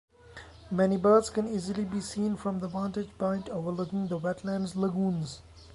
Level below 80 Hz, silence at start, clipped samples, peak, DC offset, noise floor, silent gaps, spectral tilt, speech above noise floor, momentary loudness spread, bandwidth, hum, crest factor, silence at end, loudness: -58 dBFS; 0.25 s; under 0.1%; -10 dBFS; under 0.1%; -50 dBFS; none; -6.5 dB/octave; 21 dB; 11 LU; 11.5 kHz; none; 20 dB; 0 s; -30 LUFS